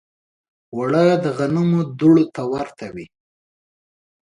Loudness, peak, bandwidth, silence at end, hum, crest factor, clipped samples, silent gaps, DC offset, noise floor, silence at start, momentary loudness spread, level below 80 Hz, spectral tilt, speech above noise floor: -18 LUFS; -2 dBFS; 10.5 kHz; 1.3 s; none; 18 dB; under 0.1%; none; under 0.1%; under -90 dBFS; 0.75 s; 18 LU; -58 dBFS; -8 dB/octave; over 72 dB